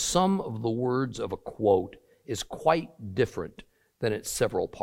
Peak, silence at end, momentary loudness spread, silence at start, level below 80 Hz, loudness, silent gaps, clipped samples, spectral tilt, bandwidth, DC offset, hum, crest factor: -8 dBFS; 0 s; 11 LU; 0 s; -54 dBFS; -29 LUFS; none; under 0.1%; -5 dB/octave; 16.5 kHz; under 0.1%; none; 20 dB